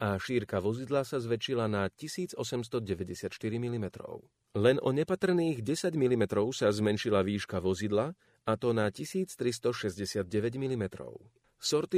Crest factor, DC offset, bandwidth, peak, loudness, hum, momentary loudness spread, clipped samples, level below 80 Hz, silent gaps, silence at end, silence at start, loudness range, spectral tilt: 20 dB; under 0.1%; 15.5 kHz; -12 dBFS; -32 LUFS; none; 9 LU; under 0.1%; -64 dBFS; none; 0 s; 0 s; 4 LU; -5.5 dB/octave